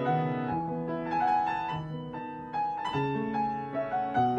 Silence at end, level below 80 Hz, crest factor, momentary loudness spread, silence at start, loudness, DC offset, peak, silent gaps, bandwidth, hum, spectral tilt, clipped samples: 0 s; -60 dBFS; 14 dB; 9 LU; 0 s; -31 LUFS; under 0.1%; -16 dBFS; none; 8.4 kHz; none; -8 dB/octave; under 0.1%